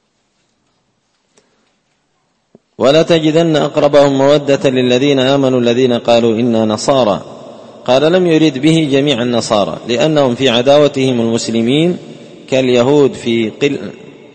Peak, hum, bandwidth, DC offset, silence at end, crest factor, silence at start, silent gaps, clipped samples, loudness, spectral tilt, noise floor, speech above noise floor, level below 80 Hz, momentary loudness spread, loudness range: 0 dBFS; none; 8.8 kHz; under 0.1%; 0.25 s; 12 dB; 2.8 s; none; under 0.1%; -12 LUFS; -5.5 dB/octave; -62 dBFS; 51 dB; -50 dBFS; 7 LU; 3 LU